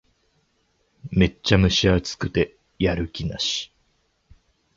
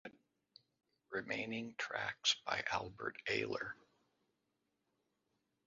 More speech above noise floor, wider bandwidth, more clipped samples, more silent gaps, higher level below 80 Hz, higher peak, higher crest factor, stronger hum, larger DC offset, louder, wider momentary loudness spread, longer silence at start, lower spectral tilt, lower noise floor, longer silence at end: about the same, 46 dB vs 44 dB; about the same, 7.8 kHz vs 7.4 kHz; neither; neither; first, -38 dBFS vs -74 dBFS; first, -2 dBFS vs -20 dBFS; about the same, 22 dB vs 24 dB; neither; neither; first, -22 LUFS vs -40 LUFS; about the same, 11 LU vs 11 LU; first, 1.05 s vs 0.05 s; first, -5 dB/octave vs -0.5 dB/octave; second, -68 dBFS vs -85 dBFS; second, 1.1 s vs 1.9 s